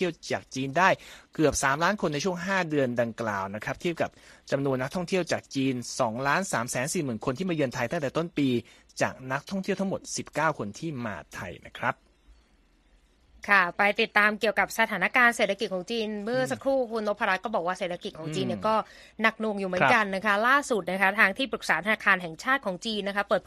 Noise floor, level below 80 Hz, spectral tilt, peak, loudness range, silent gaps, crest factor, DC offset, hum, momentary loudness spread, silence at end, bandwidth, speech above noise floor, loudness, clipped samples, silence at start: -63 dBFS; -58 dBFS; -4 dB/octave; -6 dBFS; 7 LU; none; 22 dB; under 0.1%; none; 11 LU; 0.05 s; 14 kHz; 35 dB; -27 LUFS; under 0.1%; 0 s